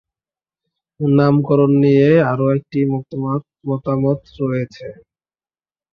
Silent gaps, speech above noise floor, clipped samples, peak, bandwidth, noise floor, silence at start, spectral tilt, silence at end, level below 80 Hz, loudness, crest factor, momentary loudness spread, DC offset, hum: none; over 74 dB; under 0.1%; -2 dBFS; 6 kHz; under -90 dBFS; 1 s; -10 dB/octave; 1 s; -54 dBFS; -16 LUFS; 16 dB; 12 LU; under 0.1%; none